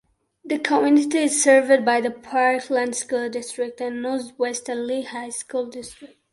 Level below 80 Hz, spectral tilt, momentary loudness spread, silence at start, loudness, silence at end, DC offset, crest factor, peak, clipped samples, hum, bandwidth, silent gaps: -68 dBFS; -2 dB/octave; 13 LU; 0.45 s; -21 LUFS; 0.25 s; under 0.1%; 18 dB; -4 dBFS; under 0.1%; none; 11.5 kHz; none